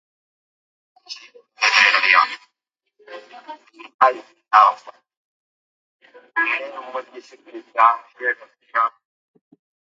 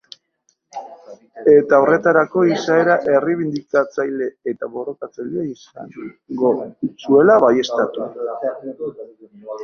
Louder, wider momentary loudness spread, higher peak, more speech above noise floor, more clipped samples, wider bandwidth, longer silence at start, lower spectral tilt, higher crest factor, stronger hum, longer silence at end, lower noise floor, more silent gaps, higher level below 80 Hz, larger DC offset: about the same, -17 LUFS vs -17 LUFS; first, 26 LU vs 22 LU; about the same, 0 dBFS vs -2 dBFS; first, 58 dB vs 48 dB; neither; first, 7.8 kHz vs 7 kHz; first, 1.1 s vs 0.75 s; second, 0.5 dB/octave vs -6.5 dB/octave; first, 22 dB vs 16 dB; neither; first, 1.05 s vs 0 s; first, -78 dBFS vs -66 dBFS; first, 3.94-3.99 s, 5.17-6.00 s vs none; second, -86 dBFS vs -62 dBFS; neither